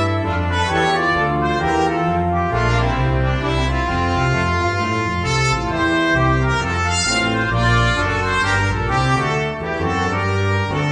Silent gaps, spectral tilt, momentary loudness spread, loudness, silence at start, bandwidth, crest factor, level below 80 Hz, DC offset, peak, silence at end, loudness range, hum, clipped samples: none; -5 dB/octave; 3 LU; -18 LUFS; 0 s; 10 kHz; 14 dB; -30 dBFS; under 0.1%; -4 dBFS; 0 s; 1 LU; none; under 0.1%